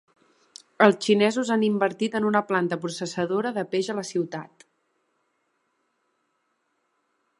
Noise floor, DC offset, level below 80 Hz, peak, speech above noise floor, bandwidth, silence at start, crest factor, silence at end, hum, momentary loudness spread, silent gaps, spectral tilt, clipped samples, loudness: -74 dBFS; under 0.1%; -76 dBFS; -2 dBFS; 50 dB; 11.5 kHz; 0.8 s; 26 dB; 2.95 s; none; 9 LU; none; -5 dB/octave; under 0.1%; -24 LUFS